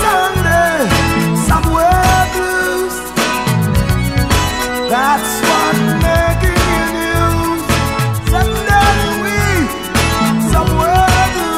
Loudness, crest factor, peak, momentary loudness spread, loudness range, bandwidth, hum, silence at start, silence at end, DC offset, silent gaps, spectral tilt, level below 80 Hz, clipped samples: -13 LUFS; 12 dB; -2 dBFS; 4 LU; 1 LU; 16 kHz; none; 0 s; 0 s; 0.5%; none; -4.5 dB/octave; -22 dBFS; under 0.1%